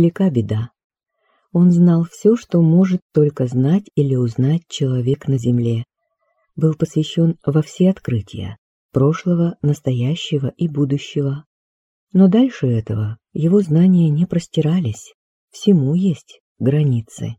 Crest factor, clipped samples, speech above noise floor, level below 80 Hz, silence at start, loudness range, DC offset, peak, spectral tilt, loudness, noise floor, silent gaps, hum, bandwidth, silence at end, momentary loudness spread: 16 dB; under 0.1%; 53 dB; -54 dBFS; 0 s; 4 LU; under 0.1%; -2 dBFS; -8.5 dB/octave; -17 LUFS; -69 dBFS; 0.84-0.90 s, 3.02-3.10 s, 8.58-8.89 s, 11.46-12.07 s, 15.14-15.48 s, 16.40-16.55 s; none; 8.2 kHz; 0.05 s; 10 LU